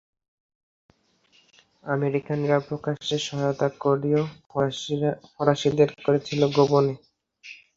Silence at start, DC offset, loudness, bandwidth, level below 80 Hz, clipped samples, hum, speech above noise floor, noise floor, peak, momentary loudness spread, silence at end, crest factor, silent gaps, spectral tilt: 1.85 s; under 0.1%; -24 LUFS; 7.8 kHz; -62 dBFS; under 0.1%; none; 39 dB; -63 dBFS; -4 dBFS; 9 LU; 0.2 s; 22 dB; none; -6 dB/octave